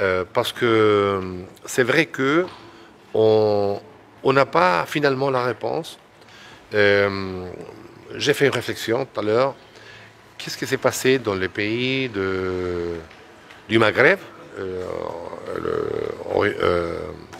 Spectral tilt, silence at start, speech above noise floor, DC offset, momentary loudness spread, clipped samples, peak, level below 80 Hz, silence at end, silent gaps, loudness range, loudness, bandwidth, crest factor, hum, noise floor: -5 dB/octave; 0 s; 25 dB; under 0.1%; 15 LU; under 0.1%; 0 dBFS; -56 dBFS; 0 s; none; 3 LU; -21 LUFS; 16 kHz; 22 dB; none; -46 dBFS